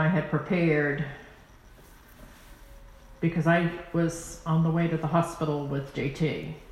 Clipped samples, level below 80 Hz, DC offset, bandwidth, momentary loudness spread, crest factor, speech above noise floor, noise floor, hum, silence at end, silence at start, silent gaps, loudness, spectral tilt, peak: under 0.1%; -52 dBFS; under 0.1%; 12.5 kHz; 9 LU; 18 dB; 25 dB; -52 dBFS; none; 0 s; 0 s; none; -27 LUFS; -7 dB/octave; -10 dBFS